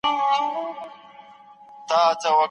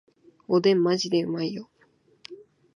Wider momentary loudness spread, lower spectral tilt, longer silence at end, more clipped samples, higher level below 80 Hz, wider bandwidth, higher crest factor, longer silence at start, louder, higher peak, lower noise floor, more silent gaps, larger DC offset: second, 20 LU vs 24 LU; second, -2 dB/octave vs -5.5 dB/octave; second, 0 s vs 0.4 s; neither; about the same, -70 dBFS vs -74 dBFS; about the same, 10.5 kHz vs 10.5 kHz; about the same, 16 dB vs 18 dB; second, 0.05 s vs 0.5 s; about the same, -22 LUFS vs -24 LUFS; about the same, -8 dBFS vs -10 dBFS; second, -47 dBFS vs -63 dBFS; neither; neither